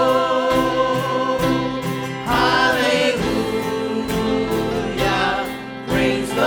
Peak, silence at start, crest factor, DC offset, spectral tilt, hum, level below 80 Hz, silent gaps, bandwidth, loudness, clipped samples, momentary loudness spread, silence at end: -4 dBFS; 0 s; 14 dB; under 0.1%; -5 dB/octave; none; -40 dBFS; none; over 20 kHz; -19 LUFS; under 0.1%; 7 LU; 0 s